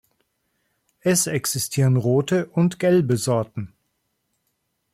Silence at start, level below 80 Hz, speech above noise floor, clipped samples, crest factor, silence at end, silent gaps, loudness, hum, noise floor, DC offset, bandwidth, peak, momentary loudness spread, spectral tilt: 1.05 s; -62 dBFS; 53 dB; under 0.1%; 16 dB; 1.25 s; none; -21 LUFS; none; -73 dBFS; under 0.1%; 16 kHz; -8 dBFS; 9 LU; -5.5 dB/octave